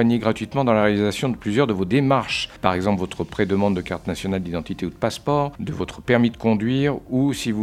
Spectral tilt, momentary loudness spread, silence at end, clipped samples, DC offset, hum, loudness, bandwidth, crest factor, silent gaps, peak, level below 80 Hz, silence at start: -6.5 dB/octave; 9 LU; 0 s; under 0.1%; under 0.1%; none; -22 LUFS; 14.5 kHz; 22 dB; none; 0 dBFS; -46 dBFS; 0 s